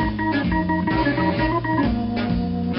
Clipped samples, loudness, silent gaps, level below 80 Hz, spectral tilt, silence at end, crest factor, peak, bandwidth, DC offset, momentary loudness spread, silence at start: under 0.1%; -21 LUFS; none; -34 dBFS; -5.5 dB/octave; 0 s; 14 dB; -8 dBFS; 5.8 kHz; under 0.1%; 3 LU; 0 s